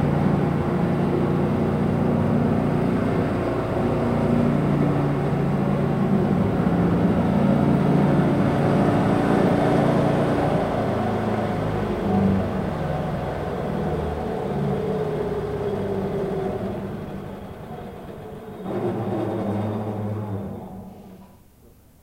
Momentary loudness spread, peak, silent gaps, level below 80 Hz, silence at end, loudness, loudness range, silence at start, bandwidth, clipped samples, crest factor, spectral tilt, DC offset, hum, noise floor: 12 LU; -8 dBFS; none; -40 dBFS; 0.75 s; -22 LUFS; 9 LU; 0 s; 15.5 kHz; under 0.1%; 14 dB; -8.5 dB/octave; under 0.1%; none; -51 dBFS